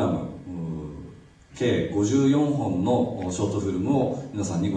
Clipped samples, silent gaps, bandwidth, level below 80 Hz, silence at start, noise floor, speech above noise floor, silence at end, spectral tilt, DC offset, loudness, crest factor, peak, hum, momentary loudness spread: under 0.1%; none; 9.6 kHz; -52 dBFS; 0 s; -47 dBFS; 24 dB; 0 s; -6.5 dB/octave; under 0.1%; -25 LUFS; 14 dB; -12 dBFS; none; 14 LU